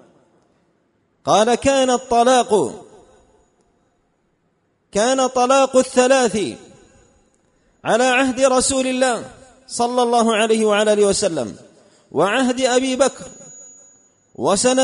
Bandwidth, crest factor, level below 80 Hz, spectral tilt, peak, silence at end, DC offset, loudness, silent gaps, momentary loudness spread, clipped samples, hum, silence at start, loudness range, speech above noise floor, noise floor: 11 kHz; 18 dB; -52 dBFS; -3 dB/octave; -2 dBFS; 0 s; under 0.1%; -17 LUFS; none; 15 LU; under 0.1%; none; 1.25 s; 4 LU; 49 dB; -65 dBFS